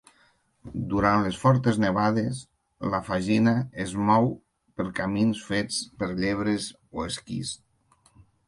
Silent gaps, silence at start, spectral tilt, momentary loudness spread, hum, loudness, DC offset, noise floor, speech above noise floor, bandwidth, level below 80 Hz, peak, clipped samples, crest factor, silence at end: none; 0.65 s; -6 dB/octave; 13 LU; none; -26 LUFS; under 0.1%; -64 dBFS; 39 dB; 11.5 kHz; -50 dBFS; -6 dBFS; under 0.1%; 20 dB; 0.95 s